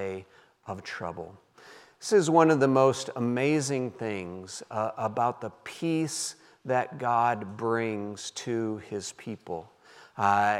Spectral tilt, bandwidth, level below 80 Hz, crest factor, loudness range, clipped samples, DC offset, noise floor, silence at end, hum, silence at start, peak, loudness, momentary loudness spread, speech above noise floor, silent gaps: -5 dB/octave; 14.5 kHz; -76 dBFS; 22 dB; 6 LU; under 0.1%; under 0.1%; -53 dBFS; 0 s; none; 0 s; -6 dBFS; -28 LUFS; 17 LU; 25 dB; none